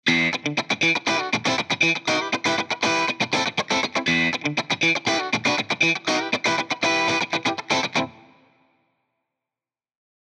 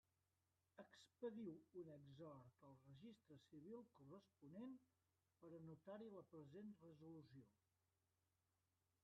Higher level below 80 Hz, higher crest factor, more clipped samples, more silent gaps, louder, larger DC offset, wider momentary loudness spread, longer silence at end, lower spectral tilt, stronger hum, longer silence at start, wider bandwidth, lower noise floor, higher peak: first, -64 dBFS vs under -90 dBFS; about the same, 16 dB vs 20 dB; neither; neither; first, -21 LUFS vs -62 LUFS; neither; second, 4 LU vs 11 LU; first, 2.15 s vs 1.5 s; second, -3 dB/octave vs -7 dB/octave; neither; second, 0.05 s vs 0.75 s; first, 12.5 kHz vs 6 kHz; about the same, under -90 dBFS vs under -90 dBFS; first, -8 dBFS vs -42 dBFS